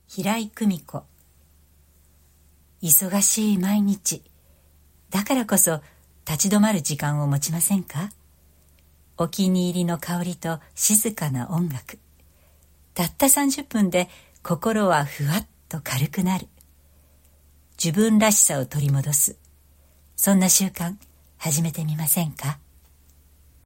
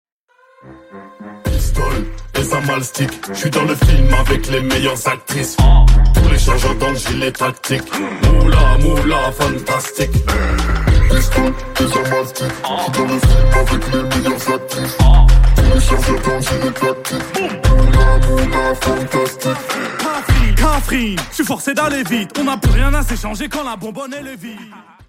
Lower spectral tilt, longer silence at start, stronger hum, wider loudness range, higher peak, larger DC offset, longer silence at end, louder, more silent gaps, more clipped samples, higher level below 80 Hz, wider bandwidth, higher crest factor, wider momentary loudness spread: about the same, -4 dB/octave vs -5 dB/octave; second, 0.1 s vs 0.65 s; neither; about the same, 4 LU vs 4 LU; about the same, -2 dBFS vs 0 dBFS; neither; first, 1.1 s vs 0.25 s; second, -21 LUFS vs -16 LUFS; neither; neither; second, -56 dBFS vs -16 dBFS; about the same, 16.5 kHz vs 16 kHz; first, 22 dB vs 14 dB; first, 15 LU vs 9 LU